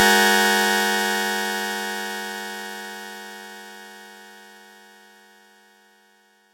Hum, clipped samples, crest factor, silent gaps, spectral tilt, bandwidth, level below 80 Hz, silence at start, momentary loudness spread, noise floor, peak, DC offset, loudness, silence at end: none; under 0.1%; 24 dB; none; -1.5 dB/octave; 16 kHz; -78 dBFS; 0 s; 25 LU; -59 dBFS; -2 dBFS; under 0.1%; -21 LUFS; 2 s